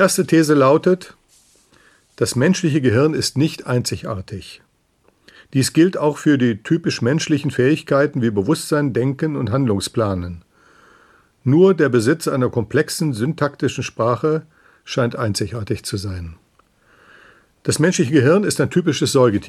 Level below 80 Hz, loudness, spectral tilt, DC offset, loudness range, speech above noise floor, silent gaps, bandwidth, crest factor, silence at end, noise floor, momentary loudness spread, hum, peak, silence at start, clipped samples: -52 dBFS; -18 LUFS; -5.5 dB/octave; under 0.1%; 5 LU; 43 dB; none; 15 kHz; 16 dB; 0 s; -60 dBFS; 12 LU; none; -2 dBFS; 0 s; under 0.1%